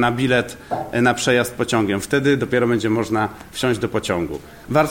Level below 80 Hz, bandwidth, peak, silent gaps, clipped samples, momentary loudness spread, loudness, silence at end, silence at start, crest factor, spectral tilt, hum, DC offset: -46 dBFS; 17 kHz; -4 dBFS; none; under 0.1%; 7 LU; -20 LUFS; 0 s; 0 s; 16 dB; -5 dB/octave; none; under 0.1%